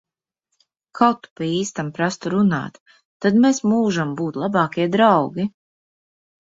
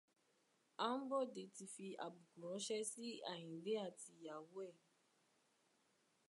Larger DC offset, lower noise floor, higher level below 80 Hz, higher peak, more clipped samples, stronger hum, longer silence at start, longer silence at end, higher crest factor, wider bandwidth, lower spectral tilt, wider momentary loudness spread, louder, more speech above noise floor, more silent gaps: neither; second, -77 dBFS vs -81 dBFS; first, -62 dBFS vs under -90 dBFS; first, -2 dBFS vs -28 dBFS; neither; neither; first, 0.95 s vs 0.8 s; second, 1 s vs 1.5 s; about the same, 18 dB vs 22 dB; second, 7.8 kHz vs 11.5 kHz; first, -6 dB/octave vs -3.5 dB/octave; about the same, 10 LU vs 11 LU; first, -20 LUFS vs -48 LUFS; first, 58 dB vs 33 dB; first, 1.31-1.36 s, 2.80-2.86 s, 3.05-3.20 s vs none